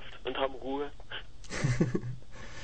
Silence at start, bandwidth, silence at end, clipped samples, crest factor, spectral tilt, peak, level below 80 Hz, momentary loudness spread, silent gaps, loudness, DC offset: 0 s; 9.4 kHz; 0 s; under 0.1%; 20 dB; -6 dB/octave; -14 dBFS; -48 dBFS; 13 LU; none; -35 LUFS; 0.9%